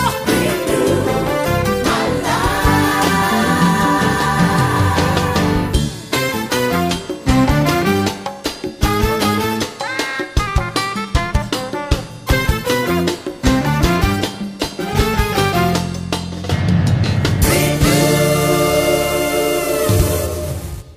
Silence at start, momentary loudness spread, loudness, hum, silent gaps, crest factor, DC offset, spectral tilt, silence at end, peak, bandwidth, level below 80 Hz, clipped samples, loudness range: 0 s; 7 LU; -16 LUFS; none; none; 14 dB; under 0.1%; -5 dB/octave; 0 s; -2 dBFS; 15.5 kHz; -26 dBFS; under 0.1%; 4 LU